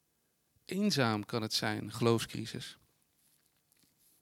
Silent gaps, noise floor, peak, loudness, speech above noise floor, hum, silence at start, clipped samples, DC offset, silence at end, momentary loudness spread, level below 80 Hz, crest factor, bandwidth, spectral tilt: none; -77 dBFS; -14 dBFS; -33 LUFS; 44 dB; none; 0.7 s; under 0.1%; under 0.1%; 1.5 s; 12 LU; -72 dBFS; 22 dB; 16.5 kHz; -4.5 dB/octave